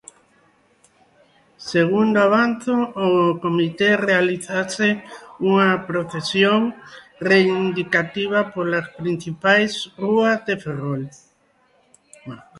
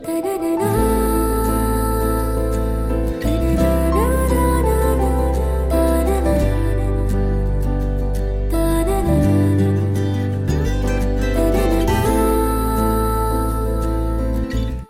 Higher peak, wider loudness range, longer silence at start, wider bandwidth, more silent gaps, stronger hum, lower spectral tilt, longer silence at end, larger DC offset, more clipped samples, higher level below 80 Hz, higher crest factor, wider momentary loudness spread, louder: about the same, -2 dBFS vs -4 dBFS; about the same, 3 LU vs 2 LU; first, 1.6 s vs 0 s; second, 11.5 kHz vs 16 kHz; neither; neither; second, -5.5 dB/octave vs -7 dB/octave; about the same, 0 s vs 0.05 s; neither; neither; second, -62 dBFS vs -20 dBFS; first, 20 dB vs 12 dB; first, 10 LU vs 5 LU; about the same, -19 LUFS vs -19 LUFS